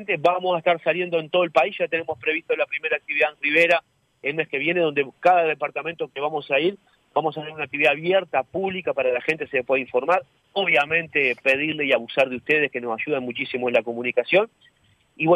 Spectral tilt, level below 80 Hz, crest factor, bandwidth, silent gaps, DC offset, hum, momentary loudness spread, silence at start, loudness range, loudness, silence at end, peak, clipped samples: -5.5 dB/octave; -70 dBFS; 18 dB; 10.5 kHz; none; under 0.1%; none; 8 LU; 0 s; 2 LU; -22 LUFS; 0 s; -6 dBFS; under 0.1%